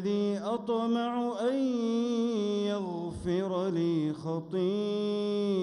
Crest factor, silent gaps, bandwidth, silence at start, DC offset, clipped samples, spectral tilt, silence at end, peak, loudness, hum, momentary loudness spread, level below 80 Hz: 12 dB; none; 10.5 kHz; 0 s; under 0.1%; under 0.1%; -7 dB/octave; 0 s; -18 dBFS; -31 LUFS; none; 4 LU; -62 dBFS